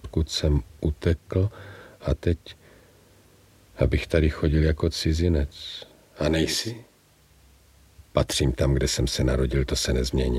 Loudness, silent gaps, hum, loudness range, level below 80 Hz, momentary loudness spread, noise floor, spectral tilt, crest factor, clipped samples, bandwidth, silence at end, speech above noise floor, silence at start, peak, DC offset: -25 LUFS; none; none; 4 LU; -32 dBFS; 11 LU; -58 dBFS; -5.5 dB/octave; 20 dB; under 0.1%; 15 kHz; 0 s; 34 dB; 0.05 s; -6 dBFS; under 0.1%